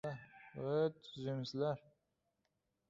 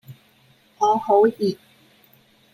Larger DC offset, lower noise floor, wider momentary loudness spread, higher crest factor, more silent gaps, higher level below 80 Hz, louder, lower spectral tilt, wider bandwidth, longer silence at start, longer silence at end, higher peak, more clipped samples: neither; first, -85 dBFS vs -57 dBFS; first, 12 LU vs 9 LU; about the same, 18 dB vs 18 dB; neither; second, -78 dBFS vs -72 dBFS; second, -41 LUFS vs -20 LUFS; about the same, -6 dB/octave vs -6 dB/octave; second, 7.6 kHz vs 15 kHz; about the same, 0.05 s vs 0.1 s; about the same, 1.1 s vs 1 s; second, -24 dBFS vs -6 dBFS; neither